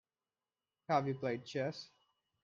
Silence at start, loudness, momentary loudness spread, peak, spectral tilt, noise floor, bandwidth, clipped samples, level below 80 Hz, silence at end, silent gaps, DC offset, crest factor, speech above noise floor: 0.9 s; -38 LUFS; 20 LU; -20 dBFS; -6.5 dB/octave; under -90 dBFS; 7.6 kHz; under 0.1%; -80 dBFS; 0.55 s; none; under 0.1%; 22 dB; over 53 dB